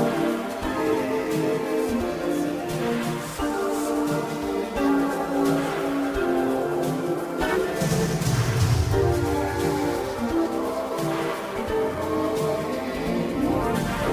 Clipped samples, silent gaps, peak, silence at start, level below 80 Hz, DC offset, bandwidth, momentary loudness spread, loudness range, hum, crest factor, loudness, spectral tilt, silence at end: under 0.1%; none; -10 dBFS; 0 s; -40 dBFS; under 0.1%; 16 kHz; 5 LU; 2 LU; none; 14 dB; -25 LUFS; -6 dB/octave; 0 s